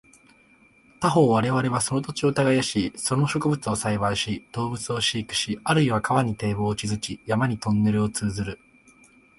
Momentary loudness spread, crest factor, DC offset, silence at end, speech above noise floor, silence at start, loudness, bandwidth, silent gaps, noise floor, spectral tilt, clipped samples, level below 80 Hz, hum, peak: 8 LU; 18 dB; under 0.1%; 0.85 s; 33 dB; 1 s; -24 LUFS; 11.5 kHz; none; -57 dBFS; -5 dB/octave; under 0.1%; -50 dBFS; none; -6 dBFS